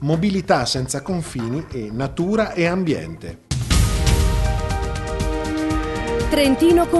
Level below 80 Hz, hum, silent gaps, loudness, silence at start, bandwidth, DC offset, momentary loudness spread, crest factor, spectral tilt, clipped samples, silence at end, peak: -26 dBFS; none; none; -21 LUFS; 0 s; 12.5 kHz; under 0.1%; 9 LU; 18 dB; -5.5 dB/octave; under 0.1%; 0 s; -2 dBFS